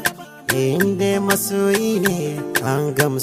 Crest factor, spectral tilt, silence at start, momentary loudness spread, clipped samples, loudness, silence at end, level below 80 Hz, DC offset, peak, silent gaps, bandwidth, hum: 18 dB; -4.5 dB/octave; 0 s; 5 LU; under 0.1%; -19 LUFS; 0 s; -54 dBFS; under 0.1%; -2 dBFS; none; 16 kHz; none